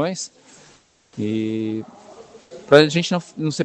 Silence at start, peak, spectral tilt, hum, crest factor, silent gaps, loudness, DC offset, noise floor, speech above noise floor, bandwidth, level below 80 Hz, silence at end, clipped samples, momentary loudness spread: 0 s; 0 dBFS; -5 dB/octave; none; 22 dB; none; -20 LUFS; under 0.1%; -53 dBFS; 34 dB; 11.5 kHz; -66 dBFS; 0 s; under 0.1%; 23 LU